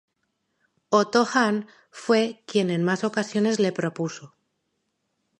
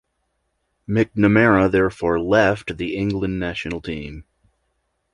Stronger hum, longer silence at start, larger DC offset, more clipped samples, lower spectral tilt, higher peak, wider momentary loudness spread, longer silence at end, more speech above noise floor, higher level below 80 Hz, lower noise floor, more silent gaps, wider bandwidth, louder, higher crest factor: neither; about the same, 0.9 s vs 0.9 s; neither; neither; second, -5 dB/octave vs -7.5 dB/octave; second, -6 dBFS vs -2 dBFS; about the same, 11 LU vs 13 LU; first, 1.15 s vs 0.9 s; about the same, 53 dB vs 53 dB; second, -74 dBFS vs -42 dBFS; first, -76 dBFS vs -72 dBFS; neither; about the same, 11 kHz vs 11 kHz; second, -24 LUFS vs -19 LUFS; about the same, 20 dB vs 18 dB